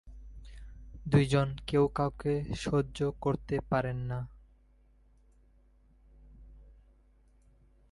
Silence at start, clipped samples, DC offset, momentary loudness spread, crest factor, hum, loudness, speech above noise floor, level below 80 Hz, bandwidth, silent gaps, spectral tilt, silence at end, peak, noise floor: 0.05 s; under 0.1%; under 0.1%; 23 LU; 22 dB; none; -31 LUFS; 33 dB; -50 dBFS; 11.5 kHz; none; -7 dB/octave; 1.2 s; -12 dBFS; -63 dBFS